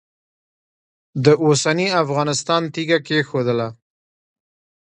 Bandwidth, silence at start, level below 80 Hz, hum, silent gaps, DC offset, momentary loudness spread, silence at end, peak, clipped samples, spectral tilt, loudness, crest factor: 10 kHz; 1.15 s; -64 dBFS; none; none; under 0.1%; 7 LU; 1.2 s; 0 dBFS; under 0.1%; -4.5 dB/octave; -18 LUFS; 20 dB